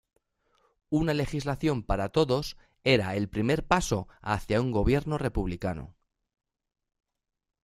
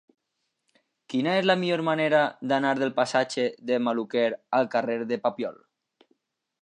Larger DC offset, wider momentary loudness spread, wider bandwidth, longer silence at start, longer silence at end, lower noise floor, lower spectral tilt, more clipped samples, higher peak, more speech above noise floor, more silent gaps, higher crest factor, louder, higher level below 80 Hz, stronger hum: neither; about the same, 7 LU vs 6 LU; first, 14.5 kHz vs 10.5 kHz; second, 0.9 s vs 1.1 s; first, 1.75 s vs 1.1 s; second, -71 dBFS vs -79 dBFS; about the same, -6 dB/octave vs -5.5 dB/octave; neither; about the same, -6 dBFS vs -6 dBFS; second, 43 dB vs 54 dB; neither; about the same, 24 dB vs 20 dB; about the same, -28 LUFS vs -26 LUFS; first, -42 dBFS vs -80 dBFS; neither